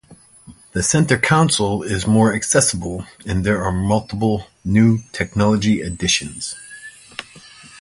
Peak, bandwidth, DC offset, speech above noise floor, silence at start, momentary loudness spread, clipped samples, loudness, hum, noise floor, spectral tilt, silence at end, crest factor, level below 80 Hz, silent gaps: 0 dBFS; 11.5 kHz; under 0.1%; 27 dB; 0.1 s; 16 LU; under 0.1%; -18 LUFS; none; -45 dBFS; -4.5 dB/octave; 0 s; 18 dB; -40 dBFS; none